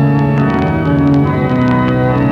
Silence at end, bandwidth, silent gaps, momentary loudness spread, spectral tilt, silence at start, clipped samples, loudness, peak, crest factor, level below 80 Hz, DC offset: 0 s; 6 kHz; none; 2 LU; -9.5 dB/octave; 0 s; under 0.1%; -12 LUFS; -2 dBFS; 8 dB; -30 dBFS; 0.2%